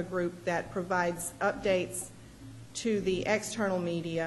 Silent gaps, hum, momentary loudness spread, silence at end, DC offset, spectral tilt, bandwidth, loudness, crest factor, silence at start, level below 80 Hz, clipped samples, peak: none; none; 12 LU; 0 s; under 0.1%; -4.5 dB/octave; 12 kHz; -32 LUFS; 18 dB; 0 s; -58 dBFS; under 0.1%; -14 dBFS